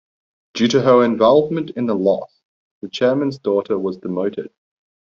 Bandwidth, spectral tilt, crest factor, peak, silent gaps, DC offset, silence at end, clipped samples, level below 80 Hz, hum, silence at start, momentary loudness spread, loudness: 7.4 kHz; -5 dB/octave; 16 dB; -2 dBFS; 2.45-2.81 s; under 0.1%; 0.7 s; under 0.1%; -60 dBFS; none; 0.55 s; 17 LU; -18 LUFS